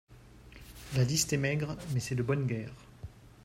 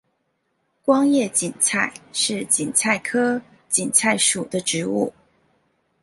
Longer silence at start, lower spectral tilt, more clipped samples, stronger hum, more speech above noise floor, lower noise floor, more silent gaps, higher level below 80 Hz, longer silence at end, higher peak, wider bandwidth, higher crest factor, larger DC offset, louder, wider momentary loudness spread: second, 0.1 s vs 0.85 s; first, -4.5 dB/octave vs -2.5 dB/octave; neither; neither; second, 22 dB vs 50 dB; second, -53 dBFS vs -71 dBFS; neither; first, -56 dBFS vs -64 dBFS; second, 0 s vs 0.95 s; second, -16 dBFS vs 0 dBFS; first, 16 kHz vs 12 kHz; about the same, 18 dB vs 22 dB; neither; second, -32 LUFS vs -20 LUFS; first, 22 LU vs 7 LU